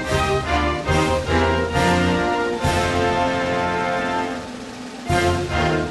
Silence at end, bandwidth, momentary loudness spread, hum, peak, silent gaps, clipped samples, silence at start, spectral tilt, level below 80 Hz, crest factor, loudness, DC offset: 0 s; 12 kHz; 7 LU; none; -4 dBFS; none; under 0.1%; 0 s; -5 dB/octave; -34 dBFS; 16 dB; -20 LUFS; under 0.1%